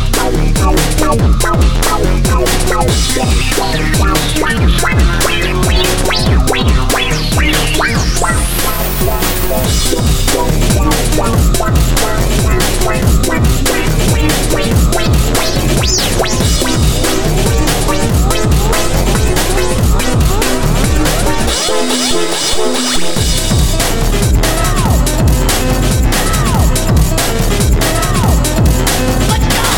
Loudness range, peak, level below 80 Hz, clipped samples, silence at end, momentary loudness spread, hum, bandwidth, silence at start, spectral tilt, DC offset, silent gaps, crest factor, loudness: 1 LU; 0 dBFS; -14 dBFS; under 0.1%; 0 s; 2 LU; none; 17.5 kHz; 0 s; -4 dB/octave; 6%; none; 12 dB; -12 LUFS